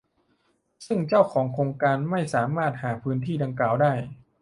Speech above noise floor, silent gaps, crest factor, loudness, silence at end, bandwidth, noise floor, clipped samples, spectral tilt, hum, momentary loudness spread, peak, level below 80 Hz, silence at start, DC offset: 45 dB; none; 20 dB; -25 LUFS; 0.25 s; 11.5 kHz; -69 dBFS; under 0.1%; -7.5 dB/octave; none; 8 LU; -4 dBFS; -62 dBFS; 0.8 s; under 0.1%